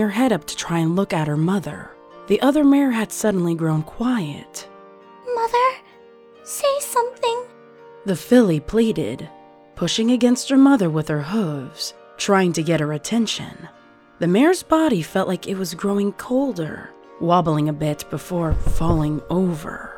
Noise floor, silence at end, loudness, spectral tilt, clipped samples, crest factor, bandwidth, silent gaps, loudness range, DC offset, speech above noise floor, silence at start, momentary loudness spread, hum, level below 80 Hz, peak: -47 dBFS; 0 s; -20 LUFS; -5.5 dB/octave; under 0.1%; 18 dB; 19 kHz; none; 5 LU; under 0.1%; 28 dB; 0 s; 14 LU; none; -36 dBFS; -2 dBFS